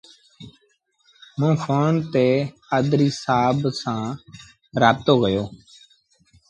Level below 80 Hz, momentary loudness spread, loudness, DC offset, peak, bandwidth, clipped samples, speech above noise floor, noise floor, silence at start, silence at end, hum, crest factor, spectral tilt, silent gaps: -54 dBFS; 12 LU; -21 LUFS; under 0.1%; -2 dBFS; 9.2 kHz; under 0.1%; 45 dB; -65 dBFS; 0.4 s; 0.95 s; none; 20 dB; -6.5 dB/octave; none